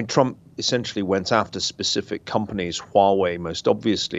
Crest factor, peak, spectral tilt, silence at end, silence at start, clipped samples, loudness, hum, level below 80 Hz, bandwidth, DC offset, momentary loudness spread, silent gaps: 20 dB; -2 dBFS; -4 dB/octave; 0 s; 0 s; under 0.1%; -22 LUFS; none; -58 dBFS; 8.2 kHz; under 0.1%; 7 LU; none